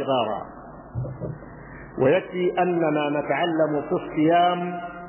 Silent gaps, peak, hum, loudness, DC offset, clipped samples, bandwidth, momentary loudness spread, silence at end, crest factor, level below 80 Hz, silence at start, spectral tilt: none; -8 dBFS; none; -23 LUFS; under 0.1%; under 0.1%; 3.2 kHz; 18 LU; 0 s; 16 dB; -52 dBFS; 0 s; -10.5 dB/octave